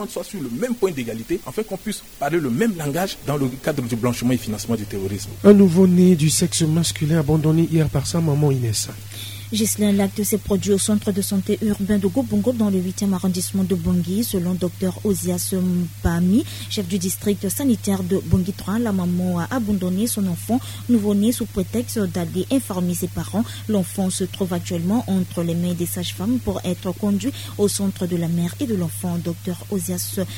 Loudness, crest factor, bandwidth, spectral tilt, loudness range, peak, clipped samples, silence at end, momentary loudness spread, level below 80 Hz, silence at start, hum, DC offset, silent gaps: -21 LUFS; 20 dB; 17 kHz; -5.5 dB/octave; 6 LU; 0 dBFS; under 0.1%; 0 s; 8 LU; -42 dBFS; 0 s; none; 0.3%; none